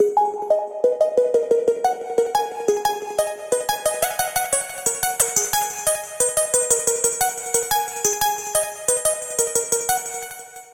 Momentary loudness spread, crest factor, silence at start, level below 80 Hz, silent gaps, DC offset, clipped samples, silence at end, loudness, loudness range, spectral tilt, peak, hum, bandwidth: 5 LU; 20 dB; 0 s; -56 dBFS; none; under 0.1%; under 0.1%; 0 s; -20 LUFS; 2 LU; -0.5 dB/octave; -2 dBFS; none; 17 kHz